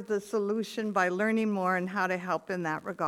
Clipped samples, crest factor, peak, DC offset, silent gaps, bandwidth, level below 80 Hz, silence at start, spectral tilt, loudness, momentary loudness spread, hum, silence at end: under 0.1%; 16 dB; -14 dBFS; under 0.1%; none; 15 kHz; -76 dBFS; 0 s; -6 dB/octave; -30 LUFS; 5 LU; none; 0 s